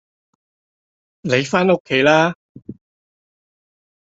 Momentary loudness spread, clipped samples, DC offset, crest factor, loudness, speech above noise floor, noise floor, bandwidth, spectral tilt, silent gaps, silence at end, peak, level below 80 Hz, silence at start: 13 LU; under 0.1%; under 0.1%; 20 dB; -16 LUFS; over 75 dB; under -90 dBFS; 8 kHz; -5 dB/octave; 1.80-1.85 s, 2.35-2.55 s; 1.45 s; -2 dBFS; -60 dBFS; 1.25 s